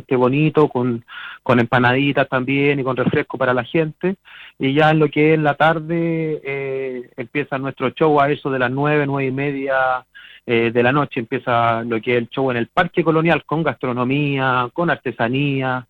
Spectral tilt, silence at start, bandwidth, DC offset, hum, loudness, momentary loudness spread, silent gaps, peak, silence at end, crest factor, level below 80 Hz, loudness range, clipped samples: -8.5 dB/octave; 0.1 s; 5.8 kHz; under 0.1%; none; -18 LUFS; 9 LU; none; -2 dBFS; 0.05 s; 16 dB; -54 dBFS; 2 LU; under 0.1%